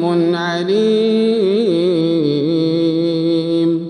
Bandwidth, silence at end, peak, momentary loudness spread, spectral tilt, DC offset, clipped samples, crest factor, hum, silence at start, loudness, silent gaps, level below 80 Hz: 9.8 kHz; 0 s; -4 dBFS; 3 LU; -7.5 dB/octave; under 0.1%; under 0.1%; 10 dB; none; 0 s; -15 LUFS; none; -64 dBFS